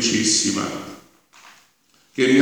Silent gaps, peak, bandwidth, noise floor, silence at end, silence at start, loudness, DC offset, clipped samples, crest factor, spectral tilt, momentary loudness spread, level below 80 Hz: none; 0 dBFS; over 20 kHz; -59 dBFS; 0 s; 0 s; -19 LUFS; under 0.1%; under 0.1%; 22 dB; -2.5 dB/octave; 18 LU; -64 dBFS